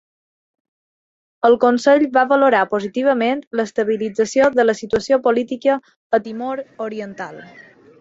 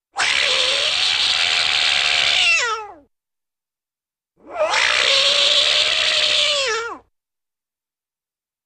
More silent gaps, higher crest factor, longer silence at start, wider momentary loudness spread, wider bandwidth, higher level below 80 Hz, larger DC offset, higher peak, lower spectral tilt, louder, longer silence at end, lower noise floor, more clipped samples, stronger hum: first, 3.47-3.51 s, 5.96-6.10 s vs none; about the same, 16 dB vs 16 dB; first, 1.45 s vs 0.15 s; first, 13 LU vs 9 LU; second, 8 kHz vs 15.5 kHz; about the same, -58 dBFS vs -58 dBFS; neither; about the same, -2 dBFS vs -2 dBFS; first, -4.5 dB/octave vs 1.5 dB/octave; about the same, -17 LUFS vs -15 LUFS; second, 0.4 s vs 1.7 s; about the same, under -90 dBFS vs under -90 dBFS; neither; neither